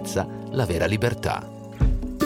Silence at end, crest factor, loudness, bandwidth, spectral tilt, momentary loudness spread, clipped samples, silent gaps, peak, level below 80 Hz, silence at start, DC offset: 0 s; 16 dB; -25 LUFS; 16.5 kHz; -6 dB/octave; 6 LU; under 0.1%; none; -10 dBFS; -30 dBFS; 0 s; under 0.1%